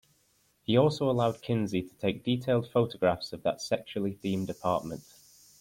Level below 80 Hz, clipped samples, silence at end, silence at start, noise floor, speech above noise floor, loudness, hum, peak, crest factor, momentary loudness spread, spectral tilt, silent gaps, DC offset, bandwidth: -62 dBFS; under 0.1%; 0.6 s; 0.7 s; -69 dBFS; 40 dB; -30 LUFS; none; -10 dBFS; 20 dB; 7 LU; -6.5 dB/octave; none; under 0.1%; 16.5 kHz